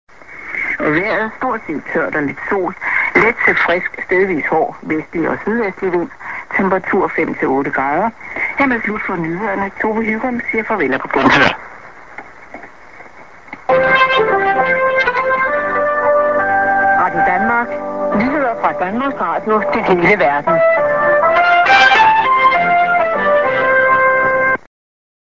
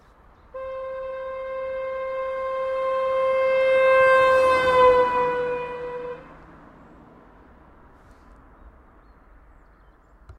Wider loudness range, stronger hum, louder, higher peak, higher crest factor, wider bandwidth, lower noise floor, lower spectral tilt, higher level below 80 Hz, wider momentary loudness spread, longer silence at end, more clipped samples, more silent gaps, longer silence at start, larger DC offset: second, 6 LU vs 15 LU; neither; first, -14 LUFS vs -21 LUFS; first, 0 dBFS vs -6 dBFS; about the same, 14 dB vs 18 dB; second, 7.6 kHz vs 10.5 kHz; second, -39 dBFS vs -53 dBFS; about the same, -5.5 dB/octave vs -4.5 dB/octave; first, -46 dBFS vs -52 dBFS; second, 10 LU vs 17 LU; first, 0.75 s vs 0.05 s; neither; neither; second, 0.3 s vs 0.55 s; first, 0.8% vs under 0.1%